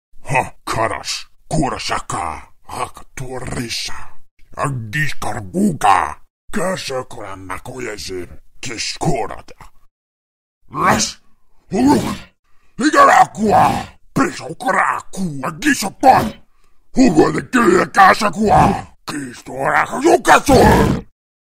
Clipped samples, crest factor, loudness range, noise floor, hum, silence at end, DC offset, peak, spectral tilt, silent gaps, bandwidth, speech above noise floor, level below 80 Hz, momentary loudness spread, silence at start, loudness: under 0.1%; 16 dB; 11 LU; -47 dBFS; none; 0.45 s; 0.5%; 0 dBFS; -4.5 dB/octave; 4.31-4.37 s, 6.30-6.48 s, 9.91-10.61 s, 12.39-12.43 s; 16 kHz; 32 dB; -36 dBFS; 18 LU; 0.15 s; -16 LUFS